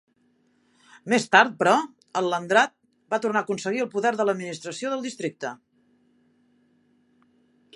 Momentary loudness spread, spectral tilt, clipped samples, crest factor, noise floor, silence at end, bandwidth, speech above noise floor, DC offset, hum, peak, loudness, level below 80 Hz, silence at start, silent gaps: 13 LU; -3.5 dB/octave; under 0.1%; 24 dB; -66 dBFS; 2.2 s; 11.5 kHz; 42 dB; under 0.1%; none; -2 dBFS; -24 LUFS; -80 dBFS; 1.05 s; none